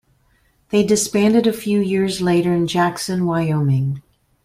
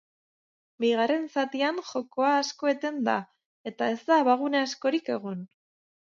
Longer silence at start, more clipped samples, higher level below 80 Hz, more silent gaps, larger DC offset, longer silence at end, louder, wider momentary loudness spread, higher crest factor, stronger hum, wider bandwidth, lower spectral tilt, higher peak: about the same, 0.7 s vs 0.8 s; neither; first, -52 dBFS vs -82 dBFS; second, none vs 3.45-3.64 s; neither; second, 0.45 s vs 0.65 s; first, -18 LUFS vs -27 LUFS; second, 6 LU vs 10 LU; about the same, 14 dB vs 18 dB; neither; first, 16 kHz vs 7.6 kHz; first, -5.5 dB/octave vs -4 dB/octave; first, -4 dBFS vs -10 dBFS